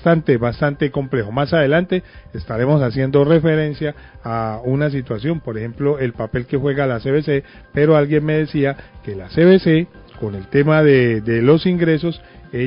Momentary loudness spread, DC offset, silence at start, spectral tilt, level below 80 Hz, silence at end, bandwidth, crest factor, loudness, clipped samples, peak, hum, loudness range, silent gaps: 14 LU; under 0.1%; 0 s; -12.5 dB/octave; -42 dBFS; 0 s; 5.4 kHz; 16 dB; -17 LUFS; under 0.1%; -2 dBFS; none; 5 LU; none